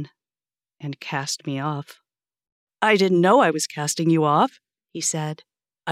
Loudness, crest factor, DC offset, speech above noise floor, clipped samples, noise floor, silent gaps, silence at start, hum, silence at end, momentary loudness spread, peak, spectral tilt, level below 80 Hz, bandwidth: -21 LUFS; 20 dB; under 0.1%; over 69 dB; under 0.1%; under -90 dBFS; 2.52-2.67 s; 0 s; none; 0 s; 19 LU; -4 dBFS; -4.5 dB/octave; -86 dBFS; 15 kHz